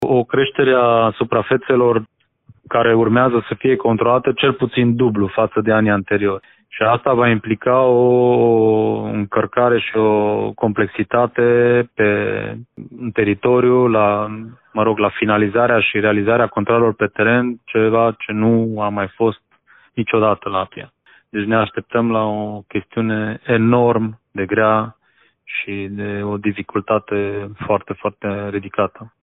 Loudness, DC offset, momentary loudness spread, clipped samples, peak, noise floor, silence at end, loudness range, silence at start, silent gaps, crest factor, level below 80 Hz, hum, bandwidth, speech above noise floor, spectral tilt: -17 LUFS; under 0.1%; 11 LU; under 0.1%; 0 dBFS; -58 dBFS; 0.15 s; 5 LU; 0 s; none; 16 dB; -54 dBFS; none; 4 kHz; 42 dB; -10 dB/octave